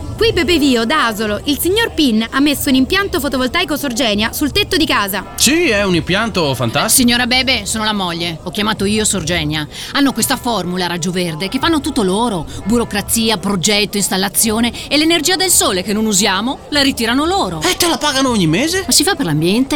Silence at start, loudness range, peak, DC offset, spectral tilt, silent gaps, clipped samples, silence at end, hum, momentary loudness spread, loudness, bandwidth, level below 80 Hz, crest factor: 0 s; 3 LU; 0 dBFS; 0.3%; -3 dB/octave; none; under 0.1%; 0 s; none; 6 LU; -14 LUFS; over 20 kHz; -36 dBFS; 14 dB